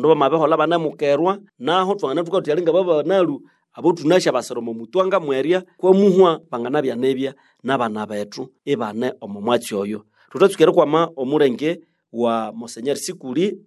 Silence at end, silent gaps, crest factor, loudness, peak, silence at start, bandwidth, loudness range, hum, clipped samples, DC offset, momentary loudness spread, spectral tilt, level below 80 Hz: 0.1 s; none; 18 dB; -19 LUFS; -2 dBFS; 0 s; 12.5 kHz; 5 LU; none; under 0.1%; under 0.1%; 13 LU; -5.5 dB/octave; -72 dBFS